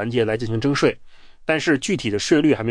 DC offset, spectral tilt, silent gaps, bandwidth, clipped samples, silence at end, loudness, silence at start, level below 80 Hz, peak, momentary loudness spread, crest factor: under 0.1%; -5 dB/octave; none; 10.5 kHz; under 0.1%; 0 s; -20 LUFS; 0 s; -48 dBFS; -4 dBFS; 6 LU; 16 dB